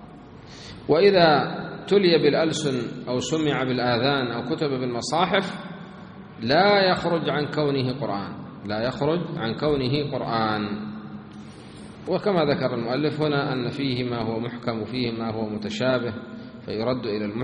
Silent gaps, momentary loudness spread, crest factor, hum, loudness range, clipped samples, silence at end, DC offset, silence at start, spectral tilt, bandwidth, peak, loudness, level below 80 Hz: none; 20 LU; 20 dB; none; 6 LU; under 0.1%; 0 s; under 0.1%; 0 s; -5.5 dB/octave; 10 kHz; -4 dBFS; -24 LUFS; -56 dBFS